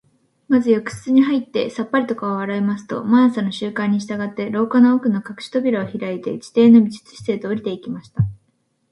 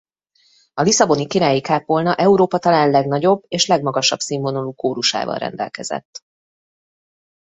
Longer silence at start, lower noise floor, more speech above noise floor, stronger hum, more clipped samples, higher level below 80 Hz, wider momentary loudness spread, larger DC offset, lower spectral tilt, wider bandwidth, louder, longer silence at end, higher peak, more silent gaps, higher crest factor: second, 0.5 s vs 0.75 s; first, -66 dBFS vs -59 dBFS; first, 48 dB vs 42 dB; neither; neither; first, -52 dBFS vs -60 dBFS; about the same, 11 LU vs 11 LU; neither; first, -7 dB/octave vs -4 dB/octave; first, 11.5 kHz vs 8.4 kHz; about the same, -19 LUFS vs -17 LUFS; second, 0.55 s vs 1.3 s; about the same, -2 dBFS vs -2 dBFS; second, none vs 6.05-6.13 s; about the same, 16 dB vs 18 dB